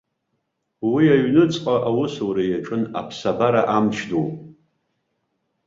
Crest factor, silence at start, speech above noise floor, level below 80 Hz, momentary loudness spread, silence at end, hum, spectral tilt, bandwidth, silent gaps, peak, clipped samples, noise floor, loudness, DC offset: 18 dB; 0.8 s; 55 dB; -58 dBFS; 10 LU; 1.15 s; none; -7 dB/octave; 7.6 kHz; none; -2 dBFS; under 0.1%; -74 dBFS; -20 LUFS; under 0.1%